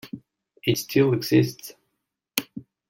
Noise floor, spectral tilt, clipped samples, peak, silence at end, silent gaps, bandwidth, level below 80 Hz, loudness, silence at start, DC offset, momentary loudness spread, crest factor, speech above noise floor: -79 dBFS; -5.5 dB/octave; under 0.1%; -2 dBFS; 0.3 s; none; 17 kHz; -64 dBFS; -23 LUFS; 0.05 s; under 0.1%; 21 LU; 24 dB; 58 dB